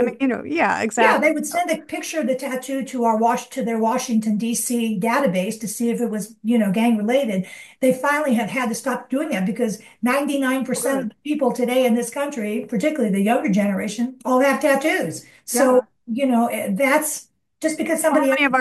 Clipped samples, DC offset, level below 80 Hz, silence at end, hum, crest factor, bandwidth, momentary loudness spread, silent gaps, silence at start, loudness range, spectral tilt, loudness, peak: under 0.1%; under 0.1%; -68 dBFS; 0 s; none; 18 dB; 12.5 kHz; 8 LU; none; 0 s; 2 LU; -4.5 dB/octave; -21 LUFS; -2 dBFS